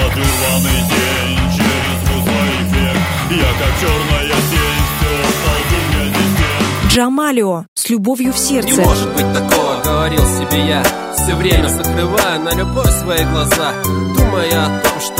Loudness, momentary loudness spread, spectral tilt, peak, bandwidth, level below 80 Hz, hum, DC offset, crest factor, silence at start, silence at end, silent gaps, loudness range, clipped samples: -14 LUFS; 3 LU; -4 dB/octave; 0 dBFS; 16.5 kHz; -22 dBFS; none; under 0.1%; 14 dB; 0 s; 0 s; 7.68-7.76 s; 1 LU; under 0.1%